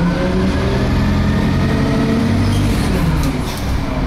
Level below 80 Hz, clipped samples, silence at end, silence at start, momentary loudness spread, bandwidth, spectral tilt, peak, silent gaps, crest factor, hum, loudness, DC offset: -22 dBFS; under 0.1%; 0 s; 0 s; 4 LU; 15.5 kHz; -6.5 dB/octave; -6 dBFS; none; 10 dB; none; -16 LUFS; under 0.1%